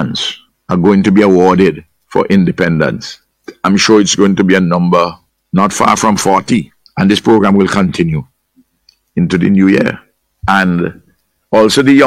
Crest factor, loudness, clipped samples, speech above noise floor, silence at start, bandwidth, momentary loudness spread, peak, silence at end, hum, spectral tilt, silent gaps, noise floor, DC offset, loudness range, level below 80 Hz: 12 dB; -11 LUFS; under 0.1%; 47 dB; 0 s; 14 kHz; 11 LU; 0 dBFS; 0 s; none; -5.5 dB/octave; none; -56 dBFS; under 0.1%; 3 LU; -42 dBFS